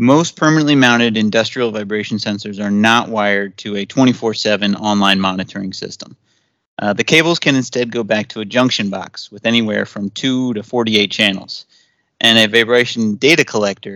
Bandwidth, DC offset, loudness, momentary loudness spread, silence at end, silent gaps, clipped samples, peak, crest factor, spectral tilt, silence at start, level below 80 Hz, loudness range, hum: 16.5 kHz; under 0.1%; -14 LUFS; 12 LU; 0 s; 6.66-6.77 s; under 0.1%; 0 dBFS; 16 dB; -4.5 dB/octave; 0 s; -62 dBFS; 4 LU; none